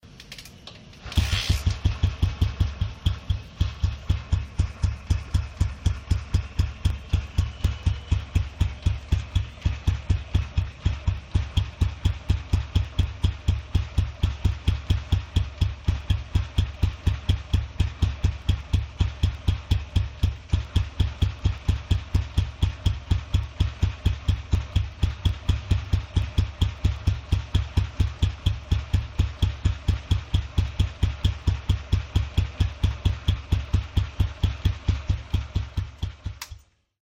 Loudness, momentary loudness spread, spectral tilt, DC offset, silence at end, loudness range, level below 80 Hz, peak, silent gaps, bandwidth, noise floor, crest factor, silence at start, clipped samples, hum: -27 LUFS; 3 LU; -6 dB/octave; under 0.1%; 0.45 s; 1 LU; -28 dBFS; -10 dBFS; none; 10.5 kHz; -46 dBFS; 16 dB; 0.05 s; under 0.1%; none